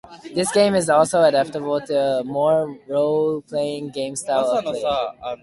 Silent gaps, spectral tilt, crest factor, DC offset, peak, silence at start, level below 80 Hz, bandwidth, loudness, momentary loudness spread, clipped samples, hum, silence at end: none; -4.5 dB/octave; 18 dB; under 0.1%; -2 dBFS; 0.05 s; -58 dBFS; 11.5 kHz; -20 LUFS; 10 LU; under 0.1%; none; 0.05 s